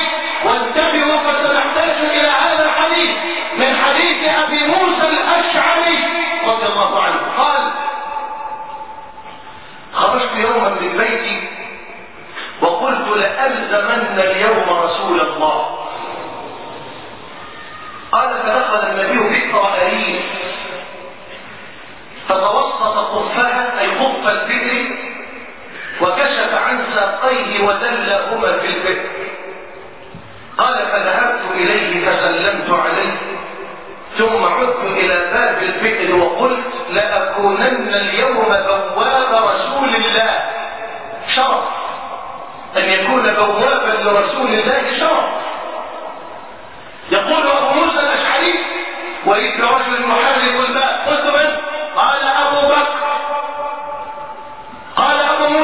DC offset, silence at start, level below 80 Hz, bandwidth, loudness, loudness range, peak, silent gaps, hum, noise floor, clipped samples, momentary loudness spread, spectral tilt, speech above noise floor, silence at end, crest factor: 1%; 0 s; -54 dBFS; 4 kHz; -15 LUFS; 5 LU; 0 dBFS; none; none; -36 dBFS; under 0.1%; 18 LU; -7 dB/octave; 21 dB; 0 s; 16 dB